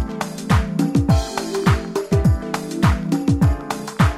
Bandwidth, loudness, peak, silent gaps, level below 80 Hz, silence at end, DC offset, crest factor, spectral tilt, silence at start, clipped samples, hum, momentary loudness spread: 15.5 kHz; -20 LUFS; -4 dBFS; none; -26 dBFS; 0 s; under 0.1%; 14 dB; -6.5 dB/octave; 0 s; under 0.1%; none; 8 LU